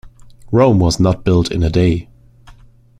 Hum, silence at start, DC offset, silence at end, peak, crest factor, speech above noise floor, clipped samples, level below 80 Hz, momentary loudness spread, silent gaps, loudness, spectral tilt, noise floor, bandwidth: none; 0.05 s; under 0.1%; 0.5 s; -2 dBFS; 14 dB; 31 dB; under 0.1%; -32 dBFS; 5 LU; none; -15 LUFS; -7 dB/octave; -44 dBFS; 11.5 kHz